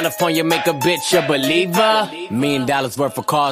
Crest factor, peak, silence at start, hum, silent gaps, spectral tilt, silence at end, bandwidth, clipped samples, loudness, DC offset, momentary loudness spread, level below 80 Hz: 16 dB; -2 dBFS; 0 s; none; none; -4 dB/octave; 0 s; 15.5 kHz; under 0.1%; -17 LUFS; under 0.1%; 6 LU; -58 dBFS